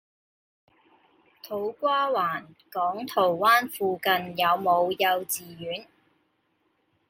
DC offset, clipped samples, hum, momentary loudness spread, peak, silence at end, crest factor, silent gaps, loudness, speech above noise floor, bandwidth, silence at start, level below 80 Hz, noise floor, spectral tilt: under 0.1%; under 0.1%; none; 14 LU; -8 dBFS; 1.25 s; 20 dB; none; -25 LUFS; 46 dB; 16.5 kHz; 1.45 s; -76 dBFS; -72 dBFS; -3 dB/octave